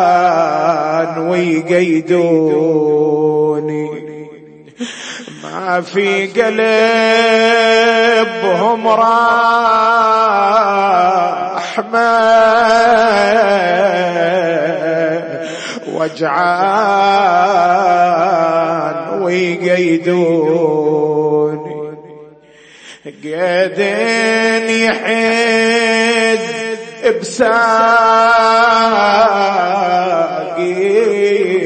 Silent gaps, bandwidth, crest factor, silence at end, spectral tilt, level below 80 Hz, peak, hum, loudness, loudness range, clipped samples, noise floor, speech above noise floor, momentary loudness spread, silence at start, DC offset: none; 8.8 kHz; 12 dB; 0 s; -4.5 dB/octave; -56 dBFS; 0 dBFS; none; -12 LUFS; 6 LU; under 0.1%; -42 dBFS; 30 dB; 10 LU; 0 s; under 0.1%